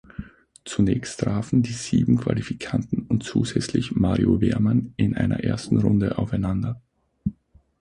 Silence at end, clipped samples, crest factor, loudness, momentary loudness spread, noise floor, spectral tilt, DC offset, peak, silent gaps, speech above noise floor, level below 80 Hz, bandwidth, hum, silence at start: 0.5 s; under 0.1%; 18 dB; -23 LUFS; 12 LU; -53 dBFS; -7 dB/octave; under 0.1%; -4 dBFS; none; 31 dB; -42 dBFS; 11 kHz; none; 0.2 s